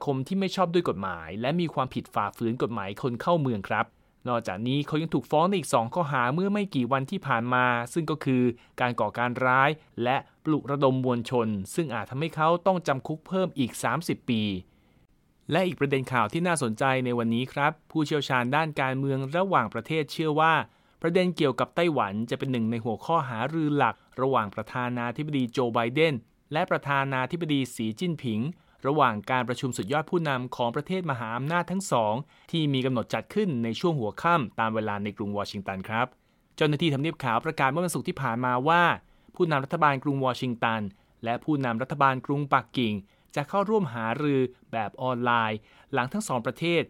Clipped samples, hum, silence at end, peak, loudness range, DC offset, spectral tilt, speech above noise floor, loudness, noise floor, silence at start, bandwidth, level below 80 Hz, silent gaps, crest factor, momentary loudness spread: under 0.1%; none; 0.05 s; -6 dBFS; 3 LU; under 0.1%; -6 dB/octave; 37 dB; -27 LUFS; -63 dBFS; 0 s; 16.5 kHz; -64 dBFS; none; 20 dB; 7 LU